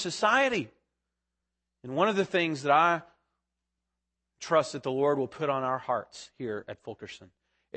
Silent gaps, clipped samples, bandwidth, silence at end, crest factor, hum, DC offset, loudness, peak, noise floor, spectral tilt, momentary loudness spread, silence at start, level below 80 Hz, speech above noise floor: none; under 0.1%; 8.8 kHz; 0.5 s; 20 dB; none; under 0.1%; -28 LUFS; -10 dBFS; -86 dBFS; -4.5 dB/octave; 20 LU; 0 s; -74 dBFS; 57 dB